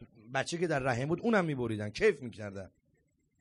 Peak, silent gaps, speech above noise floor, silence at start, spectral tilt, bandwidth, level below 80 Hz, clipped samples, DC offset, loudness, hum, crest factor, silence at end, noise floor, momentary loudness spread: -14 dBFS; none; 42 dB; 0 s; -6 dB/octave; 11.5 kHz; -60 dBFS; under 0.1%; under 0.1%; -32 LUFS; none; 20 dB; 0.7 s; -74 dBFS; 14 LU